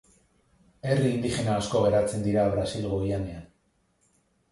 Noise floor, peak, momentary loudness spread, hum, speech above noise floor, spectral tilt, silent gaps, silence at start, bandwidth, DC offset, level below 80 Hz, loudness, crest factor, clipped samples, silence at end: -69 dBFS; -10 dBFS; 10 LU; none; 44 dB; -6.5 dB/octave; none; 0.85 s; 11.5 kHz; under 0.1%; -48 dBFS; -27 LUFS; 18 dB; under 0.1%; 1.05 s